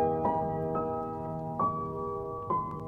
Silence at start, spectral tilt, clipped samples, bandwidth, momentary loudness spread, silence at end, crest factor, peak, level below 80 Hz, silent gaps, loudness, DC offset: 0 s; -10.5 dB/octave; under 0.1%; 5.2 kHz; 6 LU; 0 s; 16 dB; -16 dBFS; -54 dBFS; none; -33 LUFS; under 0.1%